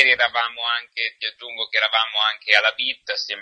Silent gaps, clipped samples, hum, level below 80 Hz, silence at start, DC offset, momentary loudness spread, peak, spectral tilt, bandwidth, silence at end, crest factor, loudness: none; under 0.1%; none; -70 dBFS; 0 s; under 0.1%; 10 LU; 0 dBFS; 1 dB/octave; 10 kHz; 0 s; 22 dB; -20 LUFS